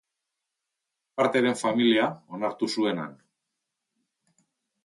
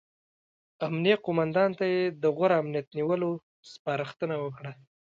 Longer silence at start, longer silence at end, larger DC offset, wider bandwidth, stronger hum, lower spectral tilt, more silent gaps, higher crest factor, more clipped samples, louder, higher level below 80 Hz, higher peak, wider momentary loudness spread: first, 1.15 s vs 0.8 s; first, 1.75 s vs 0.4 s; neither; first, 11.5 kHz vs 7.6 kHz; neither; second, -4.5 dB/octave vs -7.5 dB/octave; second, none vs 2.87-2.91 s, 3.43-3.63 s, 3.79-3.85 s; about the same, 20 dB vs 20 dB; neither; first, -25 LUFS vs -28 LUFS; second, -78 dBFS vs -72 dBFS; about the same, -8 dBFS vs -10 dBFS; about the same, 12 LU vs 12 LU